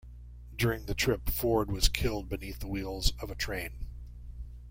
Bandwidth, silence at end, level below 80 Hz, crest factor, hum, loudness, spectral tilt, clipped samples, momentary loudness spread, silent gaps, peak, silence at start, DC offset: 16.5 kHz; 0 s; -38 dBFS; 22 dB; 60 Hz at -40 dBFS; -32 LUFS; -4.5 dB/octave; under 0.1%; 18 LU; none; -10 dBFS; 0.05 s; under 0.1%